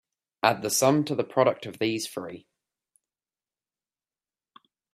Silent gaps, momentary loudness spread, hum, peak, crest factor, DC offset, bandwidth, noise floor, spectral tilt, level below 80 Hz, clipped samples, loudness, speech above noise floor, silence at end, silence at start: none; 15 LU; none; -4 dBFS; 26 dB; under 0.1%; 15.5 kHz; under -90 dBFS; -4 dB/octave; -72 dBFS; under 0.1%; -25 LUFS; over 65 dB; 2.55 s; 0.45 s